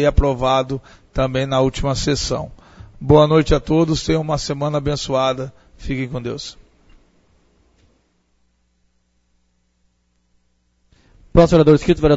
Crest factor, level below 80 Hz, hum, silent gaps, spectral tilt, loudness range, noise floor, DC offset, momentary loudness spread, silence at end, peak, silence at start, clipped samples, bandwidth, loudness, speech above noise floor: 18 dB; -30 dBFS; none; none; -6 dB/octave; 14 LU; -64 dBFS; under 0.1%; 17 LU; 0 s; 0 dBFS; 0 s; under 0.1%; 8 kHz; -18 LUFS; 47 dB